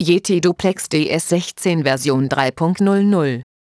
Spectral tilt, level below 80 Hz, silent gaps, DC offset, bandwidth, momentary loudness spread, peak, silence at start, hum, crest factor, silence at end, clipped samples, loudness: -5.5 dB/octave; -54 dBFS; none; under 0.1%; 11 kHz; 4 LU; -2 dBFS; 0 s; none; 16 dB; 0.2 s; under 0.1%; -17 LUFS